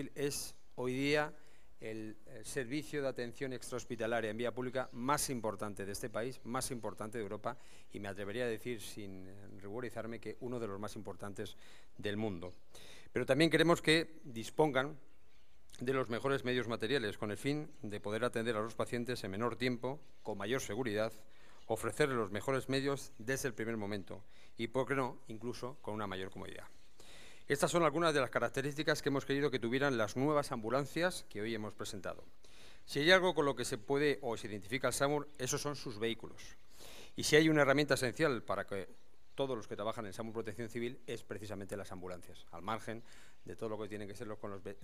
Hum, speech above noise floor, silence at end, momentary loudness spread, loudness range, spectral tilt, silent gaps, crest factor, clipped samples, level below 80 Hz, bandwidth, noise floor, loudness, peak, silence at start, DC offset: none; 32 dB; 0.1 s; 16 LU; 10 LU; -4.5 dB/octave; none; 26 dB; under 0.1%; -64 dBFS; 15.5 kHz; -70 dBFS; -37 LUFS; -12 dBFS; 0 s; 0.4%